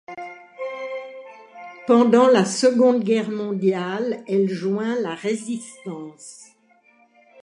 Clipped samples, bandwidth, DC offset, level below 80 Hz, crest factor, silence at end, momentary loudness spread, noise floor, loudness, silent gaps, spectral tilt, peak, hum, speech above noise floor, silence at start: under 0.1%; 11 kHz; under 0.1%; -76 dBFS; 18 dB; 1.1 s; 23 LU; -58 dBFS; -20 LUFS; none; -5.5 dB/octave; -4 dBFS; none; 38 dB; 0.1 s